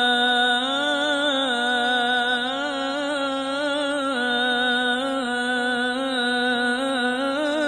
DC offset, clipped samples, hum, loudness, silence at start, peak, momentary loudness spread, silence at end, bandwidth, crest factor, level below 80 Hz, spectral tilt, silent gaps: under 0.1%; under 0.1%; none; -22 LUFS; 0 s; -8 dBFS; 5 LU; 0 s; 10.5 kHz; 14 dB; -60 dBFS; -2 dB/octave; none